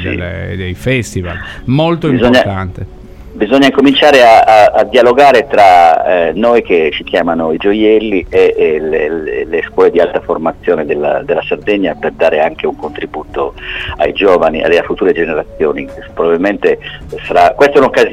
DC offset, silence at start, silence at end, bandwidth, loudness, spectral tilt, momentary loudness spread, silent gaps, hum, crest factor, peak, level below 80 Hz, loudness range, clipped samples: under 0.1%; 0 s; 0 s; 15 kHz; -10 LUFS; -6 dB/octave; 14 LU; none; none; 10 dB; 0 dBFS; -36 dBFS; 7 LU; under 0.1%